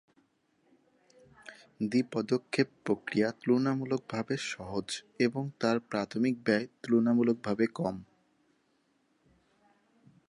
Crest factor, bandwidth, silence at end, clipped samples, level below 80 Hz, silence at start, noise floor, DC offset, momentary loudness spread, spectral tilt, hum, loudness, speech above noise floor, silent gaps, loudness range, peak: 20 dB; 11.5 kHz; 2.25 s; under 0.1%; -70 dBFS; 1.45 s; -73 dBFS; under 0.1%; 9 LU; -6 dB/octave; none; -31 LUFS; 43 dB; none; 3 LU; -12 dBFS